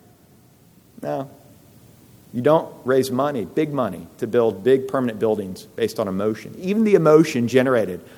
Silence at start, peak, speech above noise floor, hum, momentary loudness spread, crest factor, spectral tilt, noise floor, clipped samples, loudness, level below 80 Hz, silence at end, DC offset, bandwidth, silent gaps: 1 s; -2 dBFS; 33 dB; none; 13 LU; 18 dB; -6.5 dB/octave; -52 dBFS; under 0.1%; -20 LUFS; -64 dBFS; 0.15 s; under 0.1%; 18 kHz; none